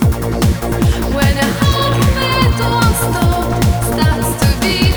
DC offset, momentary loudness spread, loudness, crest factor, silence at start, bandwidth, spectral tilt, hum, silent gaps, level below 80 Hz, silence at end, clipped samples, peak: under 0.1%; 2 LU; -14 LUFS; 12 dB; 0 s; over 20 kHz; -5 dB/octave; none; none; -20 dBFS; 0 s; under 0.1%; 0 dBFS